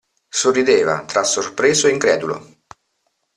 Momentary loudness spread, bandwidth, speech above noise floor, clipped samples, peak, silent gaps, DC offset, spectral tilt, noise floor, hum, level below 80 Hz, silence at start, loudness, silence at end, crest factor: 9 LU; 12 kHz; 53 dB; under 0.1%; -2 dBFS; none; under 0.1%; -2.5 dB/octave; -69 dBFS; none; -60 dBFS; 0.35 s; -17 LUFS; 0.95 s; 16 dB